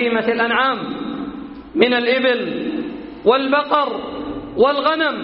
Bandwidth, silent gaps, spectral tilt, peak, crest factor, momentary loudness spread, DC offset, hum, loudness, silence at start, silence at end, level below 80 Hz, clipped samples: 5.6 kHz; none; -1.5 dB/octave; 0 dBFS; 18 dB; 12 LU; under 0.1%; none; -18 LUFS; 0 s; 0 s; -50 dBFS; under 0.1%